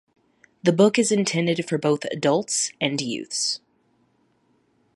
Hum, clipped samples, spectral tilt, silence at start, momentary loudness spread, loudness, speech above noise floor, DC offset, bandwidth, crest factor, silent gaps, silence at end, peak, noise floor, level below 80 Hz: none; under 0.1%; -4 dB/octave; 0.65 s; 8 LU; -22 LUFS; 43 dB; under 0.1%; 11.5 kHz; 18 dB; none; 1.4 s; -6 dBFS; -65 dBFS; -72 dBFS